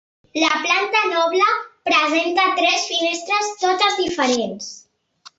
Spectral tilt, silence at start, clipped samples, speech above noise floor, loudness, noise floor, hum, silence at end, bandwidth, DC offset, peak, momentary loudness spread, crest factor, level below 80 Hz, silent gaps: -1.5 dB/octave; 0.35 s; under 0.1%; 31 dB; -18 LUFS; -49 dBFS; none; 0.6 s; 8.2 kHz; under 0.1%; -2 dBFS; 7 LU; 18 dB; -62 dBFS; none